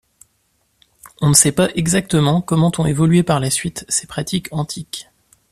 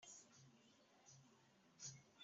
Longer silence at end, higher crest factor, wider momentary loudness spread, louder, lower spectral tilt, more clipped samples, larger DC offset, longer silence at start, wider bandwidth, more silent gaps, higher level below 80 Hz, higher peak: first, 0.5 s vs 0 s; second, 18 dB vs 24 dB; about the same, 13 LU vs 12 LU; first, -16 LUFS vs -61 LUFS; about the same, -4.5 dB/octave vs -3.5 dB/octave; neither; neither; first, 1.05 s vs 0 s; first, 14.5 kHz vs 8 kHz; neither; first, -46 dBFS vs under -90 dBFS; first, 0 dBFS vs -42 dBFS